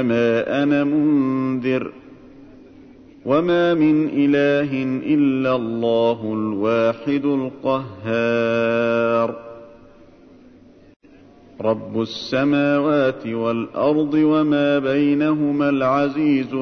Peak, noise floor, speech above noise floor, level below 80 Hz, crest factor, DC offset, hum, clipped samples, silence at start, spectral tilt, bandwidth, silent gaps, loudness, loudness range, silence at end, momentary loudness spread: -6 dBFS; -47 dBFS; 29 dB; -58 dBFS; 14 dB; under 0.1%; none; under 0.1%; 0 s; -7.5 dB/octave; 6.4 kHz; 10.96-11.00 s; -19 LUFS; 5 LU; 0 s; 6 LU